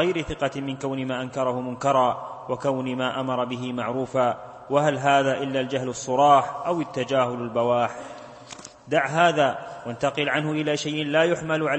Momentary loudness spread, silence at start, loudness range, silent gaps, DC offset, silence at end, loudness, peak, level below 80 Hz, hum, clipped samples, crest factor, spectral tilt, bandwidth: 11 LU; 0 s; 3 LU; none; under 0.1%; 0 s; -24 LUFS; -4 dBFS; -58 dBFS; none; under 0.1%; 20 dB; -5 dB/octave; 8.8 kHz